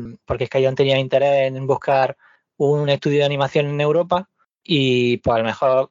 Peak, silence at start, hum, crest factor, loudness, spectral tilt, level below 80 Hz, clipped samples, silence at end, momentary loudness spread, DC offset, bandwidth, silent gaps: -4 dBFS; 0 s; none; 14 dB; -19 LUFS; -4.5 dB/octave; -52 dBFS; under 0.1%; 0.05 s; 5 LU; under 0.1%; 7.6 kHz; none